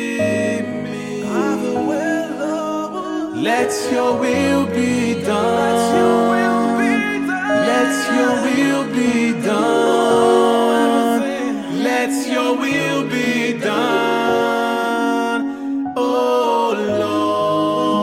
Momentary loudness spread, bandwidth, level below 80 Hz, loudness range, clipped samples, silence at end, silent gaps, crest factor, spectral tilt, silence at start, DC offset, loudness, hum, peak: 7 LU; 16 kHz; -58 dBFS; 4 LU; under 0.1%; 0 s; none; 14 dB; -4.5 dB/octave; 0 s; under 0.1%; -17 LUFS; none; -2 dBFS